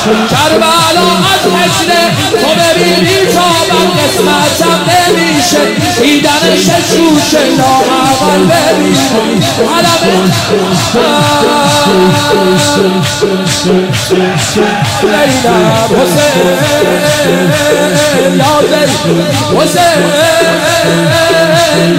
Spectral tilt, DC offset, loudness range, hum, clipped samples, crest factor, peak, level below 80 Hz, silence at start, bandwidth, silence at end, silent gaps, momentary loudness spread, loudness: -4 dB/octave; under 0.1%; 1 LU; none; under 0.1%; 8 dB; 0 dBFS; -38 dBFS; 0 s; 16.5 kHz; 0 s; none; 3 LU; -7 LUFS